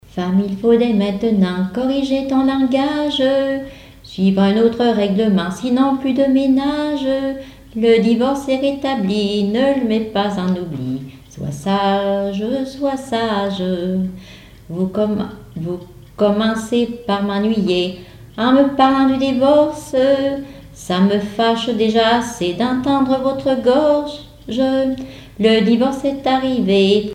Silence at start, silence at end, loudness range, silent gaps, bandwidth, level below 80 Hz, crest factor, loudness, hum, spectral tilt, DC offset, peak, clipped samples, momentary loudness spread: 0.15 s; 0 s; 5 LU; none; 13.5 kHz; -46 dBFS; 14 dB; -17 LUFS; none; -6.5 dB/octave; under 0.1%; -2 dBFS; under 0.1%; 12 LU